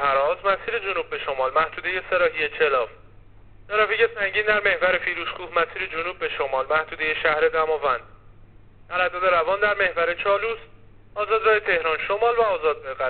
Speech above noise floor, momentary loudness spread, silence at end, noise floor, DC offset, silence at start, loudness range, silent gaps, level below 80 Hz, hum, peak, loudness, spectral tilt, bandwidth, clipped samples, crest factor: 26 dB; 7 LU; 0 s; -49 dBFS; 0.3%; 0 s; 2 LU; none; -50 dBFS; none; -4 dBFS; -22 LUFS; 0 dB/octave; 4.6 kHz; under 0.1%; 18 dB